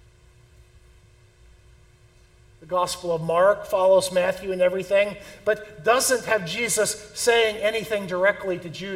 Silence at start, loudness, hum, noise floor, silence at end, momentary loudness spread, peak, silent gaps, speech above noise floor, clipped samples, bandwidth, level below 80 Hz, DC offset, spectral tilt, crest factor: 2.6 s; -22 LUFS; none; -54 dBFS; 0 s; 8 LU; -6 dBFS; none; 32 dB; under 0.1%; 17 kHz; -56 dBFS; under 0.1%; -2.5 dB/octave; 18 dB